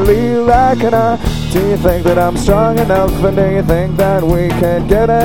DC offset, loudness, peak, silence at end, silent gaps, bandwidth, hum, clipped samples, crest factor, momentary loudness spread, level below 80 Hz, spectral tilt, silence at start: 4%; -12 LUFS; 0 dBFS; 0 s; none; 17.5 kHz; none; under 0.1%; 12 dB; 4 LU; -22 dBFS; -7 dB/octave; 0 s